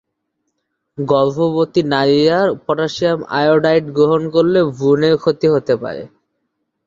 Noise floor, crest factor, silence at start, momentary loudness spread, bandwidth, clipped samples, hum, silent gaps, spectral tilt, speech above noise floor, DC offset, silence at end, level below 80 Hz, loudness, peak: -72 dBFS; 14 dB; 1 s; 6 LU; 7.6 kHz; under 0.1%; none; none; -7 dB/octave; 58 dB; under 0.1%; 0.8 s; -56 dBFS; -15 LUFS; -2 dBFS